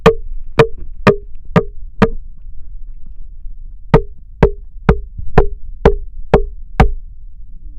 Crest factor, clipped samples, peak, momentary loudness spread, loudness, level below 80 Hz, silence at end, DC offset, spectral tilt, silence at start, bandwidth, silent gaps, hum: 16 dB; 0.3%; 0 dBFS; 15 LU; -16 LUFS; -22 dBFS; 0 s; under 0.1%; -7.5 dB/octave; 0 s; 9.2 kHz; none; none